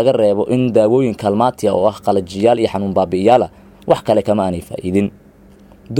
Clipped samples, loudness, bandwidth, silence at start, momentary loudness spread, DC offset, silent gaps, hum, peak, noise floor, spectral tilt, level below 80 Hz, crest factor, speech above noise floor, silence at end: under 0.1%; -15 LUFS; 16 kHz; 0 s; 6 LU; under 0.1%; none; none; 0 dBFS; -44 dBFS; -7 dB/octave; -48 dBFS; 16 dB; 29 dB; 0 s